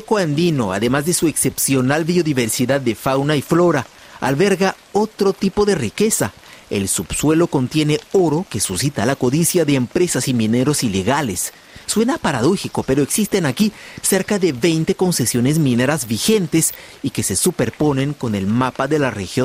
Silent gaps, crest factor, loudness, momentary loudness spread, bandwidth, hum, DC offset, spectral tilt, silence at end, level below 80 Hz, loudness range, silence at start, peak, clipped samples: none; 14 dB; -18 LUFS; 5 LU; 16 kHz; none; under 0.1%; -4.5 dB/octave; 0 s; -46 dBFS; 1 LU; 0 s; -4 dBFS; under 0.1%